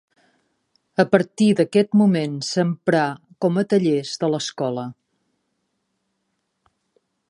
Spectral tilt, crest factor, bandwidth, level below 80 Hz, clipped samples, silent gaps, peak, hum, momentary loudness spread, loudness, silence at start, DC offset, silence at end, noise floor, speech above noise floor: -6 dB/octave; 22 dB; 11 kHz; -70 dBFS; under 0.1%; none; 0 dBFS; none; 9 LU; -20 LUFS; 1 s; under 0.1%; 2.35 s; -74 dBFS; 55 dB